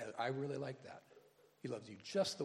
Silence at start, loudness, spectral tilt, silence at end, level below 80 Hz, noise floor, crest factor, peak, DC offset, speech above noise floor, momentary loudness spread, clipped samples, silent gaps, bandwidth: 0 s; -44 LUFS; -4.5 dB/octave; 0 s; -86 dBFS; -68 dBFS; 18 dB; -26 dBFS; under 0.1%; 25 dB; 16 LU; under 0.1%; none; 14.5 kHz